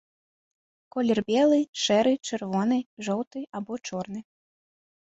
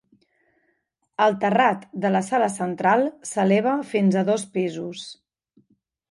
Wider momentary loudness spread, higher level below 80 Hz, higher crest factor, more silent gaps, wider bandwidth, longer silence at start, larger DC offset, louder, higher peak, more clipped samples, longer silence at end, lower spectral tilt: about the same, 13 LU vs 12 LU; about the same, -70 dBFS vs -72 dBFS; about the same, 16 dB vs 18 dB; first, 1.69-1.73 s, 2.86-2.97 s, 3.27-3.31 s vs none; second, 8.2 kHz vs 11.5 kHz; second, 0.95 s vs 1.2 s; neither; second, -26 LUFS vs -22 LUFS; second, -10 dBFS vs -6 dBFS; neither; about the same, 0.9 s vs 0.95 s; about the same, -4.5 dB/octave vs -5.5 dB/octave